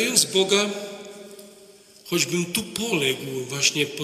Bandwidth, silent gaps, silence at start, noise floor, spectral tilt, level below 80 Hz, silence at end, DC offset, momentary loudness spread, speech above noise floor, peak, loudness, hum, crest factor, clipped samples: 15.5 kHz; none; 0 s; -50 dBFS; -2.5 dB/octave; -64 dBFS; 0 s; under 0.1%; 20 LU; 26 dB; -2 dBFS; -22 LUFS; none; 24 dB; under 0.1%